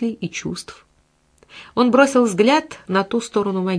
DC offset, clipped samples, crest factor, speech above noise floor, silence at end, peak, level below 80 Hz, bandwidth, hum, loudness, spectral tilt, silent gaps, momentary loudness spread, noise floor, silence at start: under 0.1%; under 0.1%; 20 dB; 42 dB; 0 s; 0 dBFS; -58 dBFS; 11 kHz; none; -18 LUFS; -5 dB/octave; none; 14 LU; -60 dBFS; 0 s